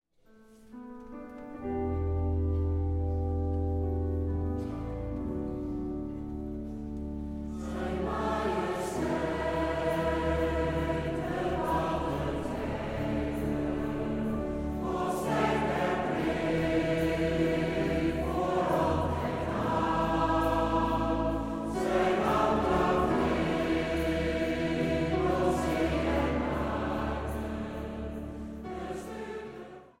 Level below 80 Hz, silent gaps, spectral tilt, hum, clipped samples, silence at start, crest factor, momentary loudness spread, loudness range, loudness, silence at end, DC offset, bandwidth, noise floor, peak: -40 dBFS; none; -7 dB/octave; none; under 0.1%; 0.5 s; 18 dB; 11 LU; 6 LU; -31 LUFS; 0.15 s; under 0.1%; 16 kHz; -59 dBFS; -12 dBFS